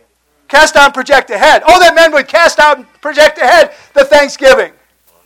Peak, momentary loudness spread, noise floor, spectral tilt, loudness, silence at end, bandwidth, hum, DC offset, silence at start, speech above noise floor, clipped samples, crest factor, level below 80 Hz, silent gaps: 0 dBFS; 6 LU; -47 dBFS; -1.5 dB/octave; -7 LUFS; 0.6 s; 17 kHz; none; under 0.1%; 0.55 s; 40 dB; 4%; 8 dB; -38 dBFS; none